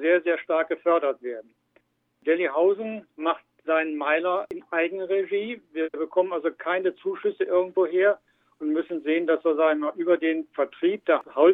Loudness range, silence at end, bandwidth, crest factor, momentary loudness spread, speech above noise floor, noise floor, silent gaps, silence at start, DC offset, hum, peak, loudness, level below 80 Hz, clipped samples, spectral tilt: 2 LU; 0 s; 3.9 kHz; 18 dB; 8 LU; 42 dB; -66 dBFS; none; 0 s; under 0.1%; none; -6 dBFS; -25 LUFS; -78 dBFS; under 0.1%; -7.5 dB/octave